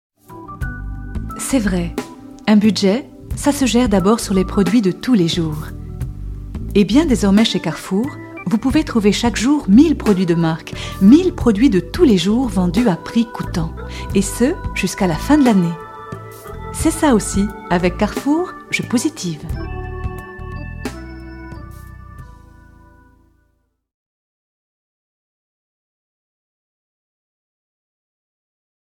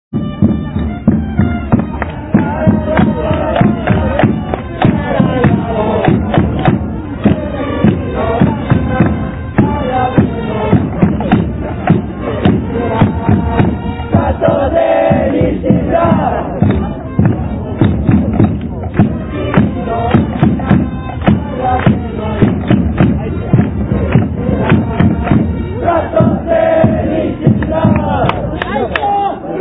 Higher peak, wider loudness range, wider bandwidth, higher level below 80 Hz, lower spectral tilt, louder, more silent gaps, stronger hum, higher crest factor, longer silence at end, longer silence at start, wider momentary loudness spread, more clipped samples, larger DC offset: about the same, 0 dBFS vs 0 dBFS; first, 11 LU vs 1 LU; first, 15.5 kHz vs 4 kHz; second, -32 dBFS vs -26 dBFS; second, -5.5 dB/octave vs -12 dB/octave; second, -16 LUFS vs -13 LUFS; neither; neither; first, 18 dB vs 12 dB; first, 6.65 s vs 0 s; first, 0.3 s vs 0.1 s; first, 18 LU vs 6 LU; neither; neither